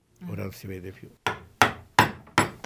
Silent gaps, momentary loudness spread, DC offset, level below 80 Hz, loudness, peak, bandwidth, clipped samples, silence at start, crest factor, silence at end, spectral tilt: none; 16 LU; under 0.1%; -52 dBFS; -26 LUFS; -2 dBFS; 16 kHz; under 0.1%; 0.2 s; 26 dB; 0.1 s; -3.5 dB/octave